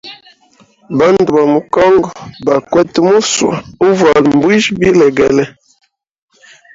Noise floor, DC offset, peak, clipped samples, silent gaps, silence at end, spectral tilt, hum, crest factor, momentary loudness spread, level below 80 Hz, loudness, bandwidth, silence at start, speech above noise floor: -49 dBFS; under 0.1%; 0 dBFS; under 0.1%; none; 1.25 s; -5 dB/octave; none; 12 dB; 8 LU; -44 dBFS; -10 LUFS; 7.8 kHz; 0.05 s; 39 dB